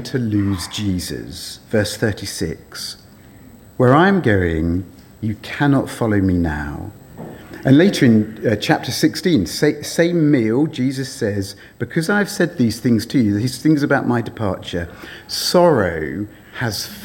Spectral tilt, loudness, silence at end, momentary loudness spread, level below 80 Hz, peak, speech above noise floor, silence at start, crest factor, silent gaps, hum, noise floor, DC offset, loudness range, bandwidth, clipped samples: -5.5 dB/octave; -18 LUFS; 0 s; 16 LU; -44 dBFS; 0 dBFS; 25 dB; 0 s; 18 dB; none; none; -43 dBFS; under 0.1%; 4 LU; 17.5 kHz; under 0.1%